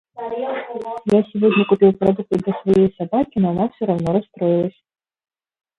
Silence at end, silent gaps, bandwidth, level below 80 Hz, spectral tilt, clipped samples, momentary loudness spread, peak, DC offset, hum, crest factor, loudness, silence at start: 1.1 s; none; 7.8 kHz; -52 dBFS; -8.5 dB/octave; under 0.1%; 11 LU; -2 dBFS; under 0.1%; none; 16 dB; -19 LUFS; 0.15 s